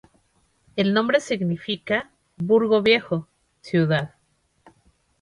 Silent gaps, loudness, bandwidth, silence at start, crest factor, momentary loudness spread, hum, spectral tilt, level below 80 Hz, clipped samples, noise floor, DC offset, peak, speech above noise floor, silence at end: none; -22 LUFS; 11 kHz; 0.75 s; 20 dB; 11 LU; none; -6 dB/octave; -62 dBFS; under 0.1%; -67 dBFS; under 0.1%; -4 dBFS; 46 dB; 1.15 s